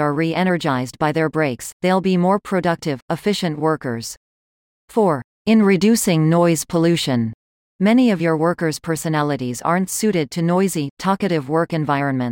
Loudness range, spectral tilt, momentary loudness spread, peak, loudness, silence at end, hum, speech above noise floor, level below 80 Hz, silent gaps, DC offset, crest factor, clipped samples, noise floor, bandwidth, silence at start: 4 LU; -5.5 dB/octave; 8 LU; -4 dBFS; -19 LUFS; 0 s; none; over 72 dB; -56 dBFS; 1.73-1.80 s, 3.02-3.08 s, 4.17-4.88 s, 5.24-5.45 s, 7.34-7.79 s, 10.90-10.97 s; under 0.1%; 14 dB; under 0.1%; under -90 dBFS; 17 kHz; 0 s